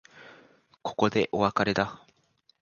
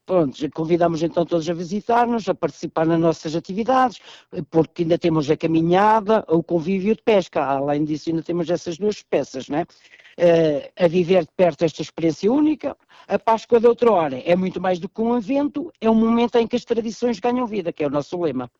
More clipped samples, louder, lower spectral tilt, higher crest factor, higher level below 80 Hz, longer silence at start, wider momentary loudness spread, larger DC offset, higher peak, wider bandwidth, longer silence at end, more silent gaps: neither; second, -27 LUFS vs -20 LUFS; second, -5.5 dB/octave vs -7 dB/octave; first, 22 dB vs 14 dB; about the same, -58 dBFS vs -56 dBFS; about the same, 0.15 s vs 0.1 s; about the same, 10 LU vs 9 LU; neither; about the same, -8 dBFS vs -6 dBFS; about the same, 7.2 kHz vs 7.8 kHz; first, 0.65 s vs 0.15 s; neither